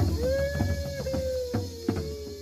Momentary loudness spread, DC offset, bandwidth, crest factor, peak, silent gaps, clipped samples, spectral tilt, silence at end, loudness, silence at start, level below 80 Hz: 5 LU; under 0.1%; 15.5 kHz; 16 dB; -12 dBFS; none; under 0.1%; -6.5 dB/octave; 0 s; -30 LUFS; 0 s; -38 dBFS